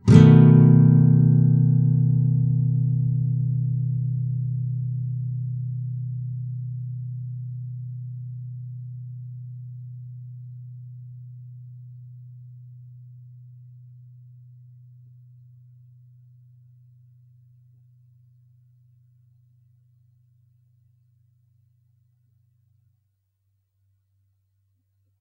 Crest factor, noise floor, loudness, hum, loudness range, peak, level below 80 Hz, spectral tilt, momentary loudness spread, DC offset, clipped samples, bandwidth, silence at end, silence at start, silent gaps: 24 dB; -72 dBFS; -20 LUFS; none; 27 LU; 0 dBFS; -54 dBFS; -10 dB/octave; 28 LU; under 0.1%; under 0.1%; 6.4 kHz; 12.4 s; 0.05 s; none